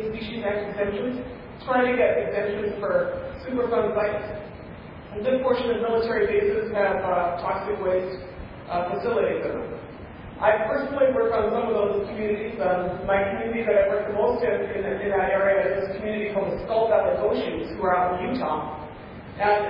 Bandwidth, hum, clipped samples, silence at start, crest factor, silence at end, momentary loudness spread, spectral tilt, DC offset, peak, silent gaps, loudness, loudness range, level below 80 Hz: 5.4 kHz; none; under 0.1%; 0 s; 18 dB; 0 s; 14 LU; -9.5 dB/octave; under 0.1%; -8 dBFS; none; -24 LUFS; 3 LU; -48 dBFS